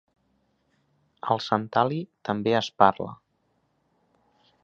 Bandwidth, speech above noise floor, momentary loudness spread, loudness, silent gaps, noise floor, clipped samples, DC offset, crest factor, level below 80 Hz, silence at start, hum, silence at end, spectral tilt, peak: 7.6 kHz; 47 dB; 15 LU; -25 LUFS; none; -71 dBFS; under 0.1%; under 0.1%; 26 dB; -66 dBFS; 1.25 s; none; 1.5 s; -6 dB/octave; -2 dBFS